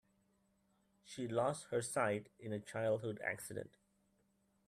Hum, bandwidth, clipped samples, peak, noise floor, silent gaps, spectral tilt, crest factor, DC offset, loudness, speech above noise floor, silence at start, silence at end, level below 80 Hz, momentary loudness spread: none; 14 kHz; under 0.1%; -22 dBFS; -78 dBFS; none; -5 dB/octave; 22 dB; under 0.1%; -41 LUFS; 38 dB; 1.05 s; 1 s; -78 dBFS; 11 LU